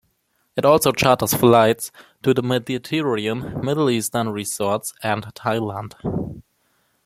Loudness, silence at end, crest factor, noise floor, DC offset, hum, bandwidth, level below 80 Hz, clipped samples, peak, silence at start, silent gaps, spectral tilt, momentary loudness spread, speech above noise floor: -20 LUFS; 0.65 s; 20 dB; -67 dBFS; under 0.1%; none; 16.5 kHz; -52 dBFS; under 0.1%; 0 dBFS; 0.55 s; none; -5 dB/octave; 12 LU; 48 dB